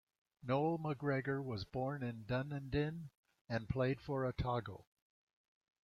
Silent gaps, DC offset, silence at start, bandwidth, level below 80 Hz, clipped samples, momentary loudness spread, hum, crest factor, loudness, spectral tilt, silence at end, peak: 3.17-3.24 s, 3.41-3.45 s; under 0.1%; 0.45 s; 6.8 kHz; -60 dBFS; under 0.1%; 11 LU; none; 18 dB; -40 LUFS; -8.5 dB/octave; 1 s; -24 dBFS